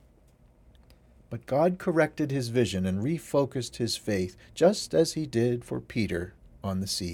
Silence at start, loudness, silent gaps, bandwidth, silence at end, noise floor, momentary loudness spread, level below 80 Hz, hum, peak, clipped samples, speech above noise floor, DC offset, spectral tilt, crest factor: 1.3 s; -28 LUFS; none; 17.5 kHz; 0 s; -59 dBFS; 9 LU; -56 dBFS; none; -8 dBFS; under 0.1%; 31 dB; under 0.1%; -5.5 dB/octave; 20 dB